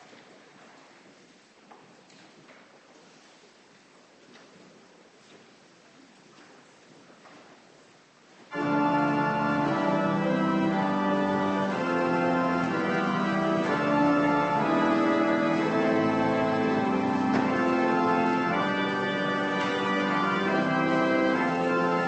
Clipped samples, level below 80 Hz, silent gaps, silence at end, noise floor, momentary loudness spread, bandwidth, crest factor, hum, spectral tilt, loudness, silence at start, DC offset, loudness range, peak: under 0.1%; -64 dBFS; none; 0 s; -57 dBFS; 3 LU; 8.6 kHz; 16 dB; none; -6.5 dB/octave; -25 LUFS; 2.5 s; under 0.1%; 4 LU; -12 dBFS